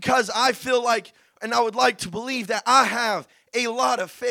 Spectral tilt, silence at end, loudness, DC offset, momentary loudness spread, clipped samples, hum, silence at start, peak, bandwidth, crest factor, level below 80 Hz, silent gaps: -2.5 dB/octave; 0 s; -22 LUFS; under 0.1%; 10 LU; under 0.1%; none; 0 s; -4 dBFS; 18 kHz; 18 dB; -62 dBFS; none